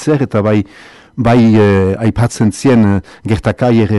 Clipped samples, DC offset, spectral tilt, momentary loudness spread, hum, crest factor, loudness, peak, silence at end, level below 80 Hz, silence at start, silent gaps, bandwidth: under 0.1%; under 0.1%; -7.5 dB/octave; 9 LU; none; 8 dB; -12 LUFS; -4 dBFS; 0 s; -36 dBFS; 0 s; none; 12 kHz